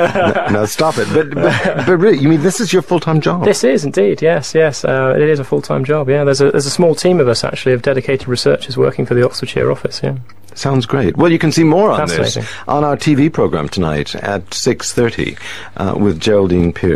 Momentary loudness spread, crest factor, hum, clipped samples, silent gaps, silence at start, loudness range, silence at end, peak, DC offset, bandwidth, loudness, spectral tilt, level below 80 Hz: 7 LU; 14 dB; none; under 0.1%; none; 0 s; 3 LU; 0 s; 0 dBFS; 2%; 14 kHz; -14 LUFS; -5.5 dB/octave; -42 dBFS